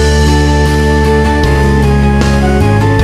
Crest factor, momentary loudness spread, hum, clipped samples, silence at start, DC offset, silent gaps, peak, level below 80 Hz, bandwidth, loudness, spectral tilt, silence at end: 8 dB; 1 LU; none; under 0.1%; 0 s; 0.9%; none; 0 dBFS; -12 dBFS; 13.5 kHz; -9 LUFS; -6.5 dB/octave; 0 s